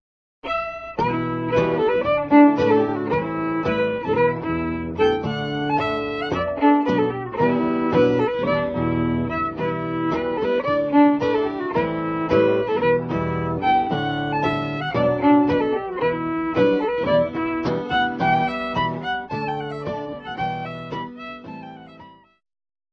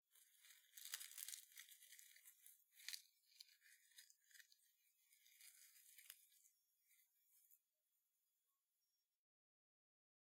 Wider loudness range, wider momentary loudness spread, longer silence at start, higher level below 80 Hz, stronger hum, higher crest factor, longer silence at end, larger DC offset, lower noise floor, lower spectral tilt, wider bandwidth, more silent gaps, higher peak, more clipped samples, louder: second, 5 LU vs 11 LU; second, 10 LU vs 15 LU; first, 0.45 s vs 0.1 s; first, -48 dBFS vs under -90 dBFS; neither; second, 18 dB vs 38 dB; second, 0.8 s vs 2.75 s; neither; second, -46 dBFS vs under -90 dBFS; first, -8 dB/octave vs 6 dB/octave; second, 6.4 kHz vs 17.5 kHz; neither; first, -4 dBFS vs -26 dBFS; neither; first, -21 LUFS vs -60 LUFS